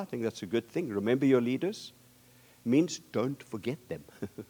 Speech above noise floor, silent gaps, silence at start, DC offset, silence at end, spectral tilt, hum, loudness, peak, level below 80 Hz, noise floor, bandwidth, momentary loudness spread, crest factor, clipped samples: 29 dB; none; 0 s; under 0.1%; 0.05 s; -6 dB/octave; none; -31 LUFS; -12 dBFS; -72 dBFS; -60 dBFS; over 20 kHz; 16 LU; 20 dB; under 0.1%